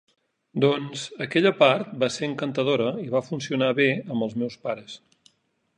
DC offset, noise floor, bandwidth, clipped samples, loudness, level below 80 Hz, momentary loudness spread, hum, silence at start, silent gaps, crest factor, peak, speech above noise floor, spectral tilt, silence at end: under 0.1%; -70 dBFS; 10 kHz; under 0.1%; -24 LUFS; -70 dBFS; 13 LU; none; 0.55 s; none; 20 dB; -4 dBFS; 46 dB; -5.5 dB/octave; 0.8 s